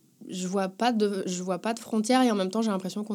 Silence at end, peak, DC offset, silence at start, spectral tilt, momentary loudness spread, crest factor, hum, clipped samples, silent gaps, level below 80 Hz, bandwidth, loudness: 0 s; -10 dBFS; under 0.1%; 0.2 s; -5 dB/octave; 8 LU; 18 dB; none; under 0.1%; none; -90 dBFS; 15.5 kHz; -27 LUFS